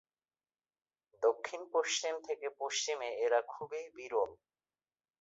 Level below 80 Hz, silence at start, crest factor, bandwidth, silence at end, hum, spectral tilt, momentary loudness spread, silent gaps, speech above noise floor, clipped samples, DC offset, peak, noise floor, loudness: -82 dBFS; 1.2 s; 20 dB; 8 kHz; 0.85 s; none; 1 dB/octave; 10 LU; none; over 54 dB; under 0.1%; under 0.1%; -18 dBFS; under -90 dBFS; -36 LUFS